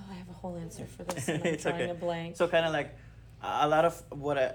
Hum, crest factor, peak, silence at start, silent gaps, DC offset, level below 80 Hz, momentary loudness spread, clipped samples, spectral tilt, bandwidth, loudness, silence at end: none; 18 dB; -14 dBFS; 0 s; none; under 0.1%; -56 dBFS; 14 LU; under 0.1%; -5 dB/octave; 19.5 kHz; -31 LUFS; 0 s